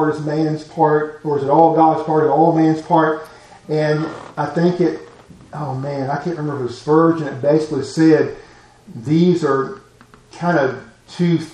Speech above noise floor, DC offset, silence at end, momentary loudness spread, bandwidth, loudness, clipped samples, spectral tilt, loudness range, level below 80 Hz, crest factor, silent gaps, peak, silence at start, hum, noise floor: 30 dB; under 0.1%; 0 s; 13 LU; 9.8 kHz; -17 LUFS; under 0.1%; -7.5 dB/octave; 6 LU; -56 dBFS; 18 dB; none; 0 dBFS; 0 s; none; -47 dBFS